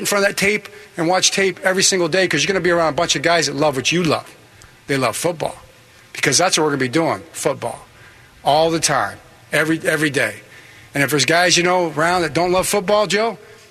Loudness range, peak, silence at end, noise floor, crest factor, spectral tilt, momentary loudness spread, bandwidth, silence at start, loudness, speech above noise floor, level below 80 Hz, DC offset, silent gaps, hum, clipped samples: 3 LU; -2 dBFS; 0.15 s; -46 dBFS; 16 dB; -3 dB/octave; 9 LU; 13.5 kHz; 0 s; -17 LUFS; 29 dB; -52 dBFS; under 0.1%; none; none; under 0.1%